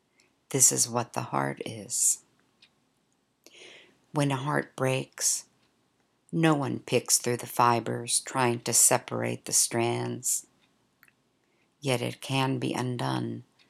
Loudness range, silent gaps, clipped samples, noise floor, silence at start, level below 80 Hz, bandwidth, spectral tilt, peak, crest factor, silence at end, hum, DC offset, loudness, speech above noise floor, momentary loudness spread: 7 LU; none; under 0.1%; -72 dBFS; 0.5 s; -78 dBFS; 16.5 kHz; -3 dB/octave; -6 dBFS; 24 dB; 0.25 s; none; under 0.1%; -26 LUFS; 45 dB; 11 LU